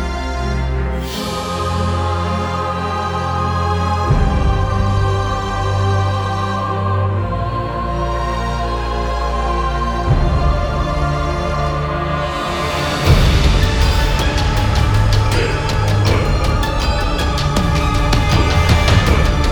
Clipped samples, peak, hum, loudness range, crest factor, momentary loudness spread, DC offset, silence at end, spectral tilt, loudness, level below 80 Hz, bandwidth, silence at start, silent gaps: under 0.1%; 0 dBFS; none; 4 LU; 16 dB; 6 LU; under 0.1%; 0 s; -5.5 dB/octave; -17 LUFS; -20 dBFS; 19.5 kHz; 0 s; none